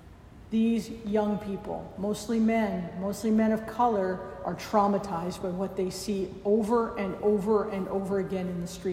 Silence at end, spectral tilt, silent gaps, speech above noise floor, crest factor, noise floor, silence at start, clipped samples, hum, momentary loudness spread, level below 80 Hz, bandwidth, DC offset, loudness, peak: 0 s; -6.5 dB/octave; none; 21 dB; 18 dB; -49 dBFS; 0 s; under 0.1%; none; 8 LU; -54 dBFS; 15.5 kHz; under 0.1%; -29 LUFS; -10 dBFS